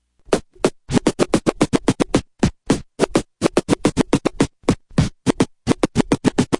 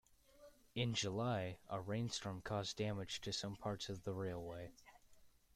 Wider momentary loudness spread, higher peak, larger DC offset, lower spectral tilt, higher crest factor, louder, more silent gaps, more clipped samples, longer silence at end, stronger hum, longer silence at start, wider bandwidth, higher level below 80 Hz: second, 4 LU vs 9 LU; first, 0 dBFS vs -26 dBFS; neither; about the same, -5.5 dB/octave vs -4.5 dB/octave; about the same, 20 dB vs 20 dB; first, -20 LUFS vs -44 LUFS; neither; neither; second, 0 s vs 0.25 s; neither; about the same, 0.3 s vs 0.35 s; second, 11.5 kHz vs 15 kHz; first, -38 dBFS vs -68 dBFS